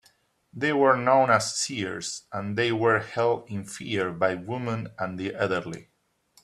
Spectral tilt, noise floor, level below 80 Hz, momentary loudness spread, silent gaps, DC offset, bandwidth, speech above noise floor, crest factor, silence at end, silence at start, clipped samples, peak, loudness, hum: -4.5 dB/octave; -64 dBFS; -66 dBFS; 13 LU; none; under 0.1%; 13 kHz; 38 dB; 22 dB; 0.6 s; 0.55 s; under 0.1%; -6 dBFS; -26 LUFS; none